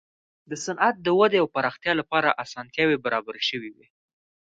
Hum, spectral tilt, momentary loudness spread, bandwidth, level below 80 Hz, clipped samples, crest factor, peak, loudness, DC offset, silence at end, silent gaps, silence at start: none; -4 dB/octave; 12 LU; 9 kHz; -64 dBFS; under 0.1%; 22 dB; -4 dBFS; -24 LUFS; under 0.1%; 0.85 s; none; 0.5 s